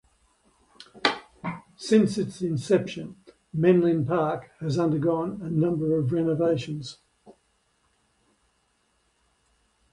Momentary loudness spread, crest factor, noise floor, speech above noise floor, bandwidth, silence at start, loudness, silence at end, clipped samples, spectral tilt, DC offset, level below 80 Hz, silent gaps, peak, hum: 15 LU; 24 dB; -70 dBFS; 45 dB; 11.5 kHz; 0.8 s; -25 LUFS; 2.6 s; under 0.1%; -7 dB/octave; under 0.1%; -62 dBFS; none; -4 dBFS; none